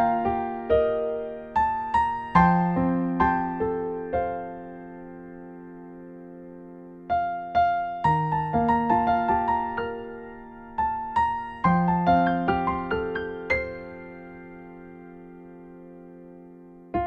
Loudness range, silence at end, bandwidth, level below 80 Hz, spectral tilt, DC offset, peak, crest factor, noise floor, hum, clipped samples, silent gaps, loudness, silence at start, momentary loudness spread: 11 LU; 0 s; 6.8 kHz; -46 dBFS; -9 dB/octave; under 0.1%; -6 dBFS; 20 dB; -47 dBFS; none; under 0.1%; none; -25 LUFS; 0 s; 22 LU